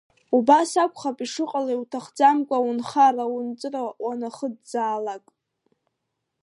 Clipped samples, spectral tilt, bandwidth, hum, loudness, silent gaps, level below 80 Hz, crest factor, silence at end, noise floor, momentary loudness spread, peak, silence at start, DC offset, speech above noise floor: under 0.1%; -3.5 dB/octave; 11.5 kHz; none; -23 LUFS; none; -78 dBFS; 20 dB; 1.25 s; -80 dBFS; 12 LU; -4 dBFS; 0.3 s; under 0.1%; 57 dB